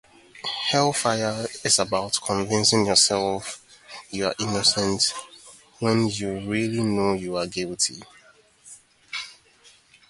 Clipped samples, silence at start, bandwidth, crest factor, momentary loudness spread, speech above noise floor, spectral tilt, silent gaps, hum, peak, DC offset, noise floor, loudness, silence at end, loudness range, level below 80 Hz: under 0.1%; 0.35 s; 11.5 kHz; 22 dB; 16 LU; 32 dB; -3 dB/octave; none; none; -4 dBFS; under 0.1%; -55 dBFS; -23 LUFS; 0.75 s; 6 LU; -56 dBFS